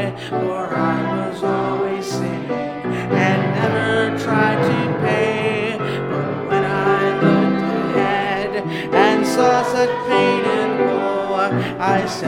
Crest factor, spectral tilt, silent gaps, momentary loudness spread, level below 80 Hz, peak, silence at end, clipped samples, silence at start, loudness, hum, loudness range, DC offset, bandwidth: 16 dB; -6 dB/octave; none; 7 LU; -52 dBFS; -2 dBFS; 0 s; under 0.1%; 0 s; -18 LUFS; none; 3 LU; under 0.1%; 16 kHz